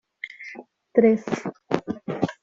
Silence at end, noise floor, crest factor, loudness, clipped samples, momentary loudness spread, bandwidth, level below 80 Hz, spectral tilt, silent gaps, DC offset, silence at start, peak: 0.1 s; -43 dBFS; 22 dB; -24 LUFS; under 0.1%; 20 LU; 7.6 kHz; -64 dBFS; -7 dB/octave; none; under 0.1%; 0.25 s; -2 dBFS